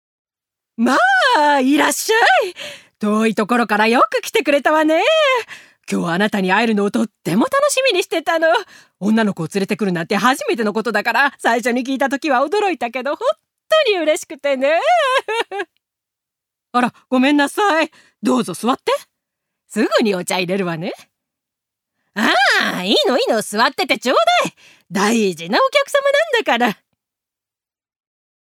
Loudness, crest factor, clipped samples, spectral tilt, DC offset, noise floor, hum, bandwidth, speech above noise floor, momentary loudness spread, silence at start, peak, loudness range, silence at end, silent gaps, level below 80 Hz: -16 LUFS; 16 dB; under 0.1%; -3.5 dB/octave; under 0.1%; -89 dBFS; none; 18 kHz; 73 dB; 9 LU; 0.8 s; 0 dBFS; 4 LU; 1.8 s; none; -72 dBFS